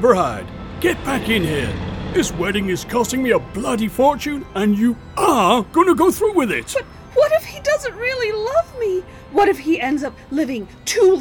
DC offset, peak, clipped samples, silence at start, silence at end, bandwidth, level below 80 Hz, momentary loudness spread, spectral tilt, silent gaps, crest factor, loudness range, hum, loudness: under 0.1%; 0 dBFS; under 0.1%; 0 s; 0 s; 19.5 kHz; -40 dBFS; 9 LU; -4.5 dB/octave; none; 18 dB; 3 LU; none; -19 LUFS